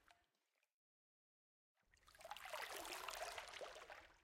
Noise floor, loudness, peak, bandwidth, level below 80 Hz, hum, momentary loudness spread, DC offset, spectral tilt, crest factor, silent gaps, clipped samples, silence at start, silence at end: -88 dBFS; -52 LUFS; -32 dBFS; 16.5 kHz; -80 dBFS; none; 9 LU; under 0.1%; -0.5 dB/octave; 26 dB; 0.72-1.75 s; under 0.1%; 0.05 s; 0 s